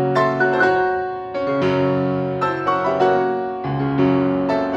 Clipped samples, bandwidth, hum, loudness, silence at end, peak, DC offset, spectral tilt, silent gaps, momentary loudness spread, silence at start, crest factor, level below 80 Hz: under 0.1%; 7.8 kHz; none; -19 LUFS; 0 s; -4 dBFS; under 0.1%; -8 dB/octave; none; 7 LU; 0 s; 14 dB; -52 dBFS